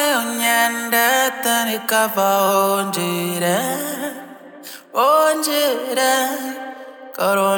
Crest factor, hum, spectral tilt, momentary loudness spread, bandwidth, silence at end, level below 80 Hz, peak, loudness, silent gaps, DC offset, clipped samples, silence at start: 16 dB; none; -2.5 dB/octave; 18 LU; 19.5 kHz; 0 s; -80 dBFS; -2 dBFS; -18 LUFS; none; under 0.1%; under 0.1%; 0 s